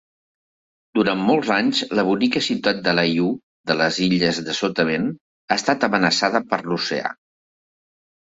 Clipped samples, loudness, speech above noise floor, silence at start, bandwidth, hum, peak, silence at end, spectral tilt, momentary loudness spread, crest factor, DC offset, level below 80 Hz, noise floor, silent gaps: under 0.1%; -20 LUFS; over 70 dB; 0.95 s; 8 kHz; none; -4 dBFS; 1.25 s; -4.5 dB/octave; 6 LU; 18 dB; under 0.1%; -60 dBFS; under -90 dBFS; 3.43-3.64 s, 5.21-5.48 s